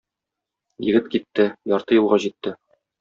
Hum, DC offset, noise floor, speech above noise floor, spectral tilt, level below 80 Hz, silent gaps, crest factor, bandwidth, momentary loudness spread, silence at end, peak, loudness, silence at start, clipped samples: none; under 0.1%; -85 dBFS; 65 dB; -4.5 dB/octave; -64 dBFS; none; 18 dB; 7.6 kHz; 11 LU; 0.45 s; -4 dBFS; -21 LUFS; 0.8 s; under 0.1%